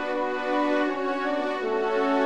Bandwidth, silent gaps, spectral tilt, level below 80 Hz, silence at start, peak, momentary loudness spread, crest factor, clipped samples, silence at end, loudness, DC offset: 9.4 kHz; none; -4.5 dB/octave; -64 dBFS; 0 s; -12 dBFS; 3 LU; 14 dB; under 0.1%; 0 s; -26 LUFS; 0.5%